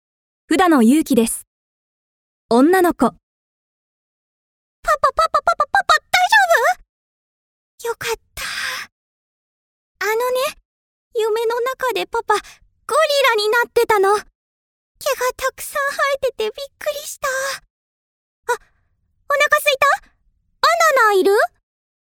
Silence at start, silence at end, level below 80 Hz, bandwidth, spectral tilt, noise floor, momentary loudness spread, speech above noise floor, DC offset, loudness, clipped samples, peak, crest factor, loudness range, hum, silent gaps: 0.5 s; 0.55 s; -52 dBFS; over 20 kHz; -2.5 dB/octave; -64 dBFS; 13 LU; 47 dB; under 0.1%; -17 LUFS; under 0.1%; 0 dBFS; 18 dB; 8 LU; none; 1.47-2.49 s, 3.23-4.83 s, 6.89-7.78 s, 8.92-9.95 s, 10.65-11.11 s, 14.35-14.95 s, 17.70-18.43 s